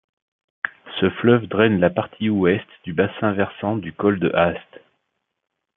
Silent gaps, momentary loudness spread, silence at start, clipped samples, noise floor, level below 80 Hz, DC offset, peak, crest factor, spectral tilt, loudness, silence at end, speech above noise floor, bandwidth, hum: none; 11 LU; 0.65 s; under 0.1%; -76 dBFS; -58 dBFS; under 0.1%; -2 dBFS; 20 dB; -11 dB/octave; -21 LUFS; 1.15 s; 57 dB; 3.9 kHz; none